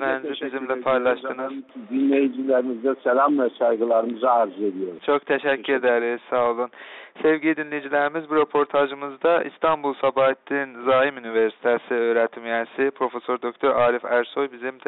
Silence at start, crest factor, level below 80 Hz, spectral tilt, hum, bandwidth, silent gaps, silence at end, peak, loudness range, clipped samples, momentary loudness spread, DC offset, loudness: 0 s; 16 dB; -66 dBFS; -2.5 dB/octave; none; 4.1 kHz; none; 0.15 s; -8 dBFS; 2 LU; under 0.1%; 7 LU; under 0.1%; -22 LUFS